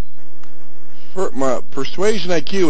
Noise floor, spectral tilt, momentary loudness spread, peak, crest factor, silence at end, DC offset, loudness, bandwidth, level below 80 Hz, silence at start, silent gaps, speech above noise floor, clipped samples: -48 dBFS; -5 dB/octave; 8 LU; -2 dBFS; 18 dB; 0 s; 30%; -21 LUFS; 8 kHz; -52 dBFS; 0.2 s; none; 29 dB; under 0.1%